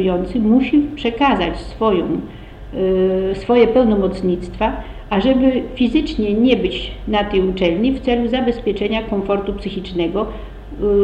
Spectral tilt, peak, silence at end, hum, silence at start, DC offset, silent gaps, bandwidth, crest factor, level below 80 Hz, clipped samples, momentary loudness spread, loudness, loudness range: -7.5 dB/octave; 0 dBFS; 0 s; none; 0 s; under 0.1%; none; 9 kHz; 16 dB; -32 dBFS; under 0.1%; 10 LU; -17 LUFS; 2 LU